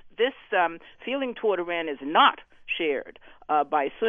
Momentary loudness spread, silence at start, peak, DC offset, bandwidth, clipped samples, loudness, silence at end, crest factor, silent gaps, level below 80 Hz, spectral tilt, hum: 12 LU; 0.05 s; -6 dBFS; under 0.1%; 3.7 kHz; under 0.1%; -25 LUFS; 0 s; 20 dB; none; -64 dBFS; -6 dB/octave; none